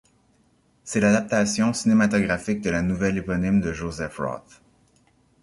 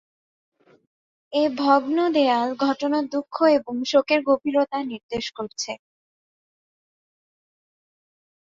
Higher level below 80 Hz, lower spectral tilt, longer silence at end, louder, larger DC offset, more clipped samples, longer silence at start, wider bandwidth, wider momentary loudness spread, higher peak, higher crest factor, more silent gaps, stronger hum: first, -46 dBFS vs -66 dBFS; first, -5.5 dB/octave vs -3.5 dB/octave; second, 1 s vs 2.7 s; about the same, -23 LUFS vs -22 LUFS; neither; neither; second, 0.85 s vs 1.3 s; first, 11.5 kHz vs 7.8 kHz; about the same, 11 LU vs 11 LU; about the same, -6 dBFS vs -4 dBFS; about the same, 18 dB vs 20 dB; second, none vs 5.03-5.09 s; neither